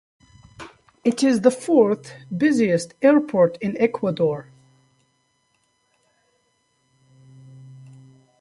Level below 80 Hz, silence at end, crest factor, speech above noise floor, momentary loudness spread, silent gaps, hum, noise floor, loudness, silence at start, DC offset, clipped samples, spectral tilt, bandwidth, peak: -64 dBFS; 0.7 s; 20 dB; 48 dB; 16 LU; none; none; -68 dBFS; -20 LUFS; 0.6 s; under 0.1%; under 0.1%; -6 dB/octave; 11.5 kHz; -4 dBFS